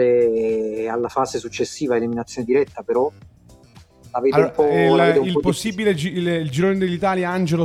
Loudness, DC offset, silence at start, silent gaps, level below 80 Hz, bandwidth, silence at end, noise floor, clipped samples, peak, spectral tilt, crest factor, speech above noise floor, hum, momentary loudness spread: -20 LUFS; under 0.1%; 0 s; none; -52 dBFS; 14 kHz; 0 s; -48 dBFS; under 0.1%; -2 dBFS; -6 dB/octave; 16 dB; 29 dB; none; 9 LU